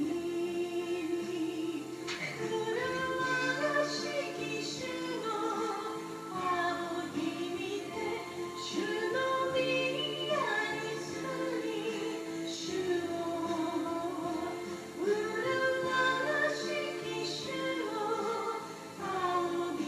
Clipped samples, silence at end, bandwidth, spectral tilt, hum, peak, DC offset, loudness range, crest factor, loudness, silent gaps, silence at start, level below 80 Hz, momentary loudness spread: under 0.1%; 0 s; 15 kHz; -4 dB/octave; none; -18 dBFS; under 0.1%; 3 LU; 16 dB; -34 LUFS; none; 0 s; -74 dBFS; 7 LU